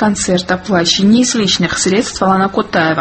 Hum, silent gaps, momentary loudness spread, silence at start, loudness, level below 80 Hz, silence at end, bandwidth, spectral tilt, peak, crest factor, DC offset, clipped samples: none; none; 5 LU; 0 s; -12 LUFS; -40 dBFS; 0 s; 8.8 kHz; -4 dB/octave; 0 dBFS; 12 dB; under 0.1%; under 0.1%